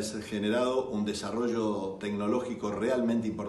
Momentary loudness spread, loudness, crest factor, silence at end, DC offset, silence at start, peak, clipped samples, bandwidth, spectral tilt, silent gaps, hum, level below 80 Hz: 6 LU; -31 LUFS; 14 dB; 0 s; under 0.1%; 0 s; -18 dBFS; under 0.1%; 12.5 kHz; -5.5 dB/octave; none; none; -62 dBFS